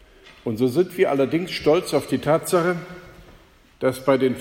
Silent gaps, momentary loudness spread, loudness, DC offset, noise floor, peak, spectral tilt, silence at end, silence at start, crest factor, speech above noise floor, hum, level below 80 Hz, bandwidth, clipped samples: none; 11 LU; -22 LUFS; under 0.1%; -51 dBFS; -6 dBFS; -5.5 dB/octave; 0 s; 0.25 s; 16 dB; 30 dB; none; -54 dBFS; 16.5 kHz; under 0.1%